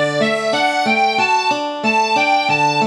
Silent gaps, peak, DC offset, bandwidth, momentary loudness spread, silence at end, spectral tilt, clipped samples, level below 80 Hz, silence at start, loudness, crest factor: none; -4 dBFS; under 0.1%; 13 kHz; 3 LU; 0 s; -3.5 dB/octave; under 0.1%; -74 dBFS; 0 s; -15 LUFS; 12 dB